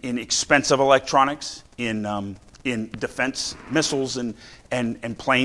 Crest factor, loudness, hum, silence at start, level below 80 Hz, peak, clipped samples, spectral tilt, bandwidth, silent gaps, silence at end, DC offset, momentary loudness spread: 24 dB; -23 LUFS; none; 0.05 s; -52 dBFS; 0 dBFS; under 0.1%; -3.5 dB/octave; 12 kHz; none; 0 s; under 0.1%; 13 LU